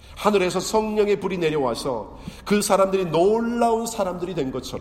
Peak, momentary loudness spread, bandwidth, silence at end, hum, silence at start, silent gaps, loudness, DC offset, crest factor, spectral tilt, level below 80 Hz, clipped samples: -4 dBFS; 9 LU; 16 kHz; 0 s; none; 0.05 s; none; -22 LUFS; under 0.1%; 18 dB; -5 dB/octave; -46 dBFS; under 0.1%